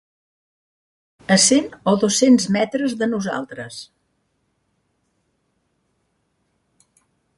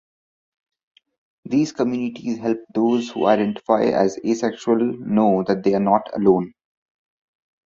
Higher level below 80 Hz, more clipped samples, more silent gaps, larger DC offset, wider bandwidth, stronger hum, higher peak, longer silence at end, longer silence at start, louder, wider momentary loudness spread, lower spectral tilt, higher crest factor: about the same, -64 dBFS vs -62 dBFS; neither; neither; neither; first, 11.5 kHz vs 7.6 kHz; neither; about the same, -2 dBFS vs -2 dBFS; first, 3.55 s vs 1.15 s; second, 1.3 s vs 1.45 s; first, -17 LUFS vs -20 LUFS; first, 19 LU vs 6 LU; second, -3.5 dB/octave vs -7 dB/octave; about the same, 20 dB vs 20 dB